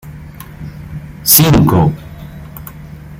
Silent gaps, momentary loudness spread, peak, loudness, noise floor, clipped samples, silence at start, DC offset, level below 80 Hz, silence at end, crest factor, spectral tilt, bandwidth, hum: none; 25 LU; 0 dBFS; -9 LUFS; -31 dBFS; 0.2%; 0.05 s; under 0.1%; -34 dBFS; 0.05 s; 14 dB; -4.5 dB/octave; 17 kHz; none